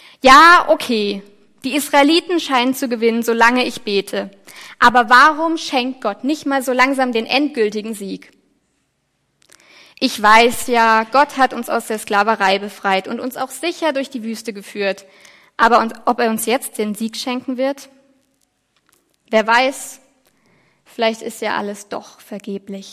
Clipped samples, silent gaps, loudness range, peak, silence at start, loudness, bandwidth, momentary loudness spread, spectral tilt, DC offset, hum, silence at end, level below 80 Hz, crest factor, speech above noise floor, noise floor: under 0.1%; none; 7 LU; 0 dBFS; 0.25 s; -15 LUFS; 16 kHz; 18 LU; -3 dB/octave; under 0.1%; none; 0 s; -54 dBFS; 18 dB; 51 dB; -67 dBFS